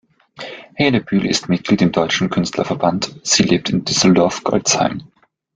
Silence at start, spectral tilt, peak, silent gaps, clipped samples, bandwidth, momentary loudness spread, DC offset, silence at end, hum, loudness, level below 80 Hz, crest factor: 0.4 s; -4 dB/octave; -2 dBFS; none; under 0.1%; 9.6 kHz; 11 LU; under 0.1%; 0.5 s; none; -16 LUFS; -50 dBFS; 16 dB